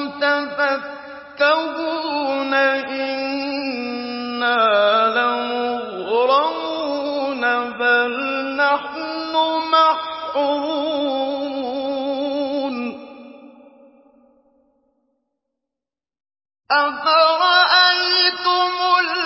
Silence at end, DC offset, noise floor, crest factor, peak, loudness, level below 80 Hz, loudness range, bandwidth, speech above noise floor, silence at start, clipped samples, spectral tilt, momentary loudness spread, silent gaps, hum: 0 s; under 0.1%; -88 dBFS; 18 dB; -2 dBFS; -18 LUFS; -66 dBFS; 10 LU; 5.8 kHz; 69 dB; 0 s; under 0.1%; -5.5 dB/octave; 10 LU; none; none